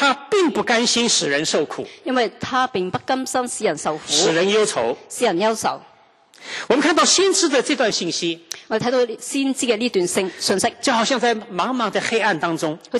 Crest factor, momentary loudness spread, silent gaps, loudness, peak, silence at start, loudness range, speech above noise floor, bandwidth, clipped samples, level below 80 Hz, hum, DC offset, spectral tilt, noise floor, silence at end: 18 dB; 8 LU; none; -19 LUFS; -2 dBFS; 0 s; 2 LU; 32 dB; 13 kHz; under 0.1%; -64 dBFS; none; under 0.1%; -2.5 dB/octave; -52 dBFS; 0 s